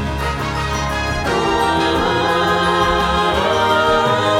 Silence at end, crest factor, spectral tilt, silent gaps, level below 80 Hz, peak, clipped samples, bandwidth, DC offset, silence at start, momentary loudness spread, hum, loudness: 0 s; 12 dB; -4.5 dB/octave; none; -30 dBFS; -4 dBFS; under 0.1%; 17 kHz; under 0.1%; 0 s; 6 LU; none; -16 LUFS